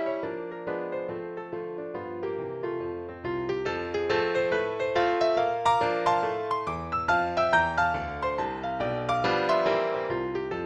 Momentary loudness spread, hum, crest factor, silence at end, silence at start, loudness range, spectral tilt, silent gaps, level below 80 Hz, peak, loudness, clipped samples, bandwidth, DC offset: 11 LU; none; 18 dB; 0 s; 0 s; 8 LU; -5.5 dB/octave; none; -54 dBFS; -10 dBFS; -28 LUFS; under 0.1%; 11 kHz; under 0.1%